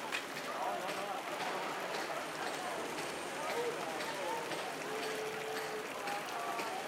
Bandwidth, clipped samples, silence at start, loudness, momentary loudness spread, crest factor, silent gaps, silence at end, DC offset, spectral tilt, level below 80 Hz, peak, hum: 16 kHz; under 0.1%; 0 s; -39 LUFS; 2 LU; 18 dB; none; 0 s; under 0.1%; -2.5 dB/octave; -82 dBFS; -20 dBFS; none